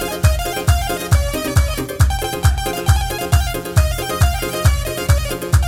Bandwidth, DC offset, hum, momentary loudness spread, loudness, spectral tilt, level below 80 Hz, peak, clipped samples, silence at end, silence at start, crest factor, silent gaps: 18 kHz; under 0.1%; none; 2 LU; -18 LUFS; -5 dB/octave; -20 dBFS; 0 dBFS; under 0.1%; 0 s; 0 s; 16 dB; none